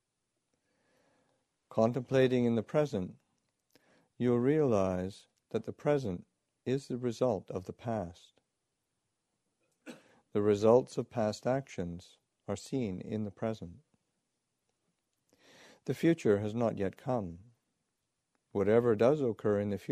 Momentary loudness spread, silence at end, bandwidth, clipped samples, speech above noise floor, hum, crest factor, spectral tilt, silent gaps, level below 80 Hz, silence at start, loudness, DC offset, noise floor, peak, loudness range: 15 LU; 0 s; 13 kHz; under 0.1%; 53 dB; none; 22 dB; -7.5 dB/octave; none; -68 dBFS; 1.7 s; -32 LUFS; under 0.1%; -84 dBFS; -12 dBFS; 8 LU